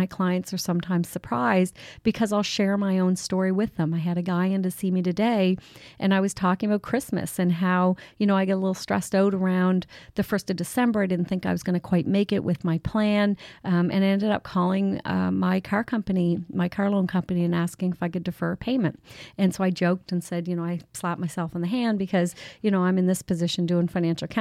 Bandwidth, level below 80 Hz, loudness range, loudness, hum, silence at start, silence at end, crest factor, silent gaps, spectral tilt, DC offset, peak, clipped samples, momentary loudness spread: 14.5 kHz; -56 dBFS; 3 LU; -25 LUFS; none; 0 s; 0 s; 14 dB; none; -6.5 dB/octave; under 0.1%; -10 dBFS; under 0.1%; 7 LU